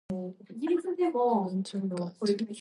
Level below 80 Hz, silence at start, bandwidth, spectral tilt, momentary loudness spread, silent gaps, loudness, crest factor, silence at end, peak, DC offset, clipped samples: -70 dBFS; 0.1 s; 11.5 kHz; -7 dB/octave; 10 LU; none; -30 LUFS; 16 dB; 0 s; -14 dBFS; under 0.1%; under 0.1%